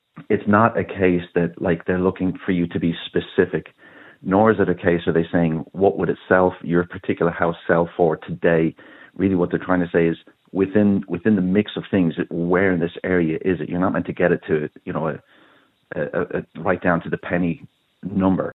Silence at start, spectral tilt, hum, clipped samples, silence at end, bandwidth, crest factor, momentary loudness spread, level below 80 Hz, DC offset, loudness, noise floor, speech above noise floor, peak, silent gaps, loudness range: 0.15 s; -11 dB/octave; none; under 0.1%; 0 s; 4.1 kHz; 20 dB; 8 LU; -52 dBFS; under 0.1%; -21 LUFS; -56 dBFS; 36 dB; 0 dBFS; none; 4 LU